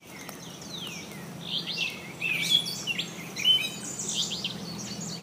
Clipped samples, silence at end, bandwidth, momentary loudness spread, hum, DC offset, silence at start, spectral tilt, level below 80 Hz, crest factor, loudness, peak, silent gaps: under 0.1%; 0 s; 15.5 kHz; 17 LU; none; under 0.1%; 0 s; -1.5 dB/octave; -66 dBFS; 20 dB; -28 LUFS; -10 dBFS; none